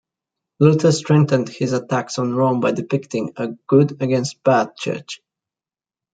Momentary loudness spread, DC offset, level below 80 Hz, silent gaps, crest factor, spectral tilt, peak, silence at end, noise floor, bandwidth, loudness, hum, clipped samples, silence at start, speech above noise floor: 11 LU; under 0.1%; -62 dBFS; none; 18 dB; -6.5 dB/octave; -2 dBFS; 0.95 s; under -90 dBFS; 9.2 kHz; -19 LUFS; none; under 0.1%; 0.6 s; over 72 dB